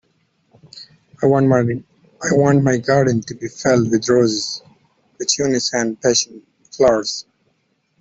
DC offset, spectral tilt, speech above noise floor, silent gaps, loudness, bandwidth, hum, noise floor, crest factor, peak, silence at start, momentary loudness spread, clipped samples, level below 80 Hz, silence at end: under 0.1%; -4.5 dB/octave; 49 dB; none; -17 LUFS; 8.4 kHz; none; -65 dBFS; 16 dB; -2 dBFS; 0.75 s; 13 LU; under 0.1%; -54 dBFS; 0.8 s